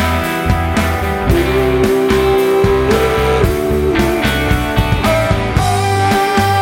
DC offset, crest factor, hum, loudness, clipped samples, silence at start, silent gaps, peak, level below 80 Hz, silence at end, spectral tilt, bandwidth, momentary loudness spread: under 0.1%; 12 dB; none; -13 LUFS; under 0.1%; 0 s; none; 0 dBFS; -22 dBFS; 0 s; -5.5 dB/octave; 17 kHz; 3 LU